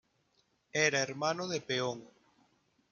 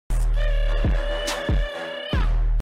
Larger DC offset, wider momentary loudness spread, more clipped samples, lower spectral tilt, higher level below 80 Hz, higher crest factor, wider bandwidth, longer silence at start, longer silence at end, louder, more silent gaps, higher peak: neither; first, 9 LU vs 3 LU; neither; second, -3 dB/octave vs -5 dB/octave; second, -78 dBFS vs -22 dBFS; first, 22 dB vs 6 dB; second, 10.5 kHz vs 12 kHz; first, 0.75 s vs 0.1 s; first, 0.85 s vs 0 s; second, -33 LUFS vs -26 LUFS; neither; about the same, -14 dBFS vs -14 dBFS